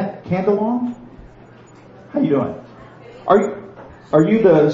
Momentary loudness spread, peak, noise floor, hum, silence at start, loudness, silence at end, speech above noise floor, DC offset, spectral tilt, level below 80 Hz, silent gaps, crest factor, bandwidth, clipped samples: 21 LU; 0 dBFS; -43 dBFS; none; 0 s; -18 LUFS; 0 s; 28 dB; under 0.1%; -8.5 dB/octave; -52 dBFS; none; 18 dB; 7.4 kHz; under 0.1%